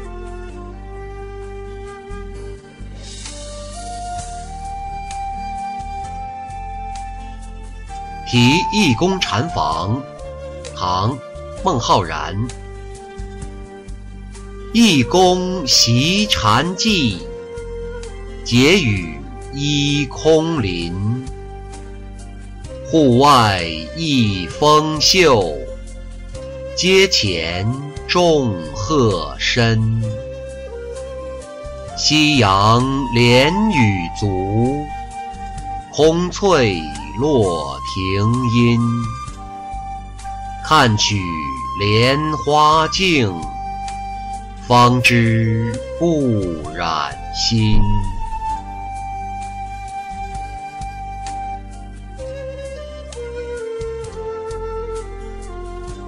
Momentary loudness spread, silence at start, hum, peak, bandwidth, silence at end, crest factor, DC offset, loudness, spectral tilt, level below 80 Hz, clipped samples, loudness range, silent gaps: 20 LU; 0 s; none; -2 dBFS; 16 kHz; 0 s; 16 dB; under 0.1%; -16 LUFS; -4.5 dB/octave; -32 dBFS; under 0.1%; 14 LU; none